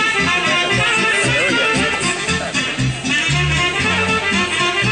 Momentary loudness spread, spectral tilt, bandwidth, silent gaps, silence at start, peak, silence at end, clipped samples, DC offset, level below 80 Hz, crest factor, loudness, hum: 4 LU; -3 dB/octave; 11 kHz; none; 0 s; -4 dBFS; 0 s; under 0.1%; under 0.1%; -38 dBFS; 12 dB; -15 LUFS; none